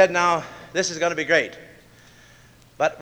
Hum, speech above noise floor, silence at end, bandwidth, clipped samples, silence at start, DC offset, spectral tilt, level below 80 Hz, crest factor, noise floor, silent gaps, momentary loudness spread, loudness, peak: none; 30 dB; 0 s; over 20 kHz; under 0.1%; 0 s; under 0.1%; -3 dB/octave; -60 dBFS; 22 dB; -51 dBFS; none; 11 LU; -22 LUFS; -2 dBFS